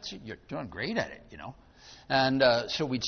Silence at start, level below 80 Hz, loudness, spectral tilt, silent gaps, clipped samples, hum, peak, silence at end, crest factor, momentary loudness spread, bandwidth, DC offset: 0 s; -58 dBFS; -28 LUFS; -4.5 dB/octave; none; under 0.1%; none; -10 dBFS; 0 s; 20 dB; 21 LU; 6.6 kHz; under 0.1%